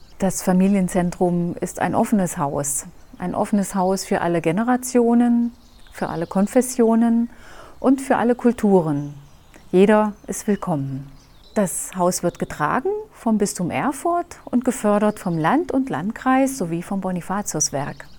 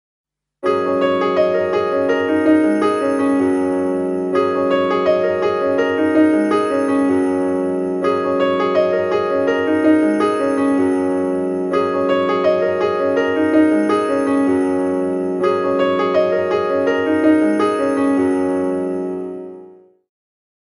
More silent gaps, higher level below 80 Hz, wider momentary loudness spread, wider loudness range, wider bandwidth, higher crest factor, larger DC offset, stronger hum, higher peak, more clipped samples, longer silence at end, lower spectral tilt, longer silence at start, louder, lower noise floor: neither; first, -48 dBFS vs -62 dBFS; first, 9 LU vs 5 LU; about the same, 3 LU vs 1 LU; first, 19 kHz vs 11.5 kHz; about the same, 18 dB vs 14 dB; neither; neither; about the same, -4 dBFS vs -2 dBFS; neither; second, 0 s vs 1 s; about the same, -5.5 dB/octave vs -6.5 dB/octave; second, 0.1 s vs 0.6 s; second, -21 LUFS vs -17 LUFS; about the same, -45 dBFS vs -43 dBFS